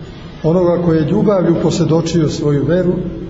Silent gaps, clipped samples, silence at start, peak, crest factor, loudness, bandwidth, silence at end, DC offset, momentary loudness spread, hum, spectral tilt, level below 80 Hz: none; under 0.1%; 0 s; -2 dBFS; 12 dB; -14 LUFS; 8 kHz; 0 s; under 0.1%; 4 LU; none; -7.5 dB/octave; -36 dBFS